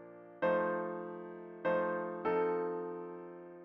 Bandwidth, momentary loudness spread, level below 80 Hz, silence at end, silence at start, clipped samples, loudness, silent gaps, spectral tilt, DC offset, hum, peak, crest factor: 5.4 kHz; 15 LU; -76 dBFS; 0 s; 0 s; under 0.1%; -36 LUFS; none; -5.5 dB/octave; under 0.1%; none; -20 dBFS; 16 dB